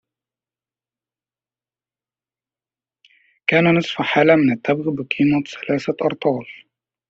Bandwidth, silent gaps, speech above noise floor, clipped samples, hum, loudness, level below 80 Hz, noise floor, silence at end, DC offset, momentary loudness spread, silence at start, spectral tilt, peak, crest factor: 7.8 kHz; none; over 72 dB; under 0.1%; none; -18 LUFS; -62 dBFS; under -90 dBFS; 0.55 s; under 0.1%; 9 LU; 3.5 s; -4.5 dB/octave; -2 dBFS; 20 dB